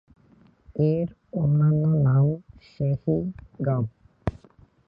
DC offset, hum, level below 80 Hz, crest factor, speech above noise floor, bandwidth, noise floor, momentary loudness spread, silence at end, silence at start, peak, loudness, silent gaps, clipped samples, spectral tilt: under 0.1%; none; -48 dBFS; 18 dB; 35 dB; 5.2 kHz; -57 dBFS; 13 LU; 0.5 s; 0.75 s; -8 dBFS; -25 LUFS; none; under 0.1%; -12 dB/octave